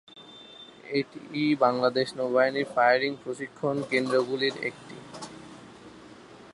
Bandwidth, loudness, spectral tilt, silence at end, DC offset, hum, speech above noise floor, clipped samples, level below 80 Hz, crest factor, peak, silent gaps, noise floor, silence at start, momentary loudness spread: 11.5 kHz; -26 LUFS; -5 dB/octave; 0 s; under 0.1%; none; 23 dB; under 0.1%; -72 dBFS; 20 dB; -8 dBFS; none; -49 dBFS; 0.15 s; 23 LU